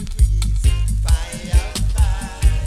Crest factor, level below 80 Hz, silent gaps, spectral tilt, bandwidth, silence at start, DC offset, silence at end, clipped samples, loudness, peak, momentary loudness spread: 14 dB; -18 dBFS; none; -4.5 dB/octave; 13.5 kHz; 0 s; under 0.1%; 0 s; under 0.1%; -20 LUFS; -2 dBFS; 2 LU